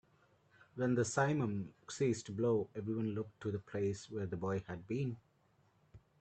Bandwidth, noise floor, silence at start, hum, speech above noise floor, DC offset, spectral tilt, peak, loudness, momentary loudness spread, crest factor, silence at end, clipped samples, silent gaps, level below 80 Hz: 9 kHz; -73 dBFS; 0.75 s; none; 35 dB; under 0.1%; -6.5 dB/octave; -18 dBFS; -38 LUFS; 9 LU; 20 dB; 0.2 s; under 0.1%; none; -72 dBFS